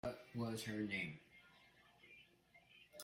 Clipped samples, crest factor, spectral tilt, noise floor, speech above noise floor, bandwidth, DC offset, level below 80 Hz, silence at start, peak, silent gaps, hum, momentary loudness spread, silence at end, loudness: under 0.1%; 18 dB; -5 dB/octave; -70 dBFS; 25 dB; 16 kHz; under 0.1%; -76 dBFS; 0.05 s; -32 dBFS; none; none; 23 LU; 0 s; -45 LUFS